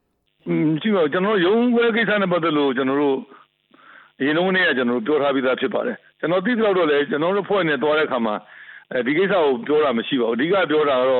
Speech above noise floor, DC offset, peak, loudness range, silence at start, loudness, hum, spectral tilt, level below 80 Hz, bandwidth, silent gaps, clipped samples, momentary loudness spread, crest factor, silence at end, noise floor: 33 dB; under 0.1%; -10 dBFS; 2 LU; 0.45 s; -20 LUFS; none; -10 dB/octave; -66 dBFS; 4.3 kHz; none; under 0.1%; 7 LU; 10 dB; 0 s; -52 dBFS